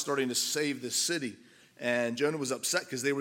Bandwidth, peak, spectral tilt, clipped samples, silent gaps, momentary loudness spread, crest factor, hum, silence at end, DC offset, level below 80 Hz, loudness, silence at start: 17 kHz; -10 dBFS; -2.5 dB/octave; under 0.1%; none; 4 LU; 20 dB; none; 0 s; under 0.1%; -82 dBFS; -31 LUFS; 0 s